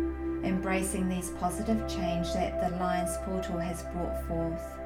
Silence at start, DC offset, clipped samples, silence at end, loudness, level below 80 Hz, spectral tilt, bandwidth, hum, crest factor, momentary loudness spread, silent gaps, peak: 0 s; under 0.1%; under 0.1%; 0 s; -32 LUFS; -42 dBFS; -5.5 dB/octave; 17.5 kHz; none; 14 dB; 5 LU; none; -16 dBFS